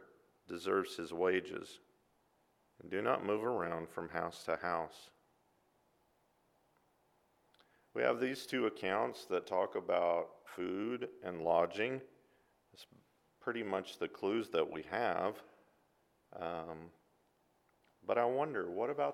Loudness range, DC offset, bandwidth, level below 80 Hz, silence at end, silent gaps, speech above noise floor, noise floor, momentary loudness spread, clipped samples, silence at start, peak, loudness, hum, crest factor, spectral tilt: 7 LU; under 0.1%; 16 kHz; -78 dBFS; 0 s; none; 38 dB; -75 dBFS; 12 LU; under 0.1%; 0 s; -18 dBFS; -38 LUFS; none; 22 dB; -5.5 dB/octave